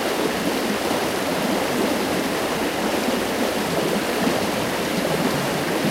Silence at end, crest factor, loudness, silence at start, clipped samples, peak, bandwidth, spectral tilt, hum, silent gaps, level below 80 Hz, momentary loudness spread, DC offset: 0 s; 14 dB; -22 LUFS; 0 s; under 0.1%; -8 dBFS; 16 kHz; -4 dB/octave; none; none; -50 dBFS; 1 LU; under 0.1%